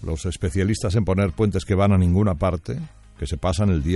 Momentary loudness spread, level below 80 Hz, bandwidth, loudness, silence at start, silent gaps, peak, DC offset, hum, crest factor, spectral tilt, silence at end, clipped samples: 13 LU; -36 dBFS; 11.5 kHz; -22 LUFS; 0 s; none; -6 dBFS; under 0.1%; none; 16 dB; -7 dB/octave; 0 s; under 0.1%